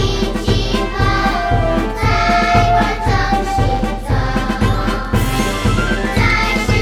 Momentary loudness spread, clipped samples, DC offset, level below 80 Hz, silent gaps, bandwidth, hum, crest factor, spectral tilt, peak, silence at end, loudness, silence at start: 5 LU; under 0.1%; under 0.1%; -22 dBFS; none; 16 kHz; none; 14 dB; -5.5 dB/octave; 0 dBFS; 0 s; -16 LUFS; 0 s